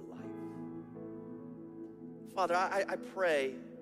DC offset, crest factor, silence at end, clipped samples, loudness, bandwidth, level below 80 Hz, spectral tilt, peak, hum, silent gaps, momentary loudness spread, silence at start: under 0.1%; 18 dB; 0 s; under 0.1%; -36 LUFS; 14.5 kHz; -76 dBFS; -4.5 dB/octave; -20 dBFS; none; none; 17 LU; 0 s